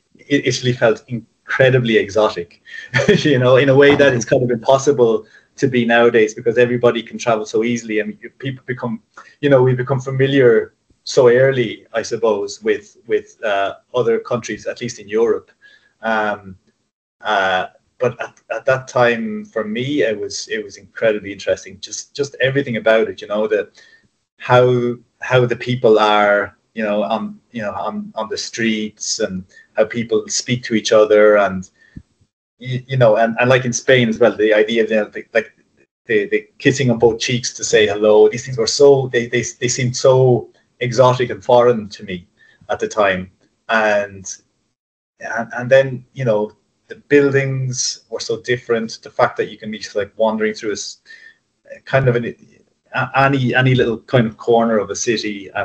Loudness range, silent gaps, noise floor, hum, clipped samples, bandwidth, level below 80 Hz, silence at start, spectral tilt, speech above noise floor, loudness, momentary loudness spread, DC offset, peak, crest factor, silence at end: 7 LU; 16.93-17.19 s, 24.32-24.37 s, 32.33-32.57 s, 35.91-36.05 s, 44.79-45.14 s; -42 dBFS; none; under 0.1%; 8.8 kHz; -56 dBFS; 0.3 s; -5 dB/octave; 26 dB; -16 LUFS; 14 LU; under 0.1%; 0 dBFS; 16 dB; 0 s